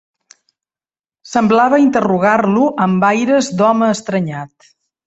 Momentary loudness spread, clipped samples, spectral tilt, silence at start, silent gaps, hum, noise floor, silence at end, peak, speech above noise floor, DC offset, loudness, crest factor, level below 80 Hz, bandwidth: 9 LU; under 0.1%; -6 dB/octave; 1.25 s; none; none; under -90 dBFS; 0.6 s; -2 dBFS; over 77 dB; under 0.1%; -14 LUFS; 14 dB; -56 dBFS; 8.2 kHz